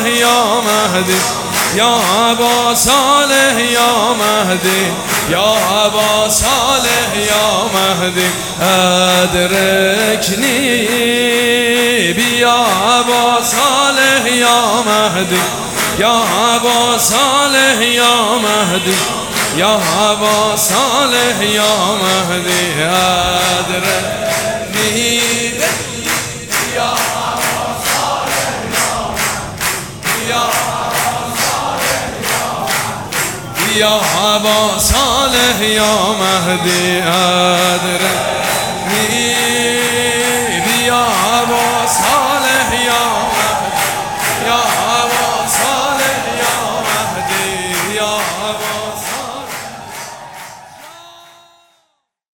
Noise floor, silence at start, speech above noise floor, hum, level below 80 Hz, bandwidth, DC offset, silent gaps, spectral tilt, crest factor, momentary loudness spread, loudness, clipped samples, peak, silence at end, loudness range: -64 dBFS; 0 s; 52 dB; none; -40 dBFS; over 20 kHz; 0.3%; none; -2 dB/octave; 14 dB; 7 LU; -12 LUFS; under 0.1%; 0 dBFS; 1.15 s; 5 LU